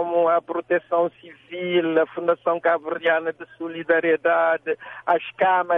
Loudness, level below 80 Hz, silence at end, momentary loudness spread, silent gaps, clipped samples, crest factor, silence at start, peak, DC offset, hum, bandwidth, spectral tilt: -22 LUFS; -72 dBFS; 0 s; 11 LU; none; under 0.1%; 16 dB; 0 s; -6 dBFS; under 0.1%; none; 3.8 kHz; -8 dB/octave